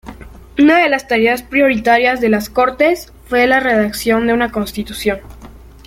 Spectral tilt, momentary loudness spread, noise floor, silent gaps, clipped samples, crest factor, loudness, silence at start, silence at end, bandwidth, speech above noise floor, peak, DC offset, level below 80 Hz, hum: -4.5 dB/octave; 9 LU; -37 dBFS; none; under 0.1%; 14 dB; -14 LUFS; 0.05 s; 0.3 s; 16.5 kHz; 23 dB; 0 dBFS; under 0.1%; -40 dBFS; none